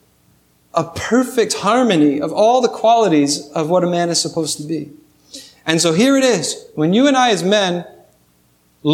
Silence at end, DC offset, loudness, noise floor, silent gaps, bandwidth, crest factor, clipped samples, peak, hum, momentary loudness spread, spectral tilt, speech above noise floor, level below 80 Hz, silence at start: 0 s; under 0.1%; -16 LUFS; -57 dBFS; none; 16 kHz; 16 dB; under 0.1%; -2 dBFS; 60 Hz at -50 dBFS; 11 LU; -4 dB/octave; 42 dB; -58 dBFS; 0.75 s